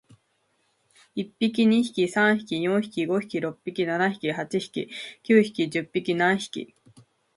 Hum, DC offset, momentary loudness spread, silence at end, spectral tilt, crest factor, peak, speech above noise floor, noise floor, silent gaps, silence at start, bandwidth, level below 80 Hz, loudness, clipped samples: none; under 0.1%; 14 LU; 0.7 s; -5.5 dB/octave; 20 dB; -6 dBFS; 46 dB; -70 dBFS; none; 1.15 s; 11.5 kHz; -70 dBFS; -25 LUFS; under 0.1%